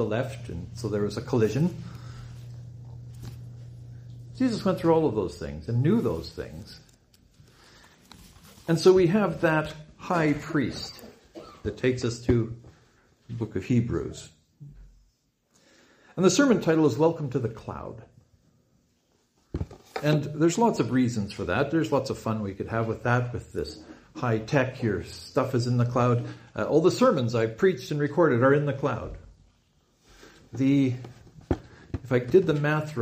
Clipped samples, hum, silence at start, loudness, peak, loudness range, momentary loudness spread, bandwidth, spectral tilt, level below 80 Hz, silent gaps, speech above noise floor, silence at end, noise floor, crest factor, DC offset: under 0.1%; none; 0 s; -26 LUFS; -6 dBFS; 7 LU; 21 LU; 15.5 kHz; -6.5 dB/octave; -50 dBFS; none; 44 dB; 0 s; -69 dBFS; 20 dB; under 0.1%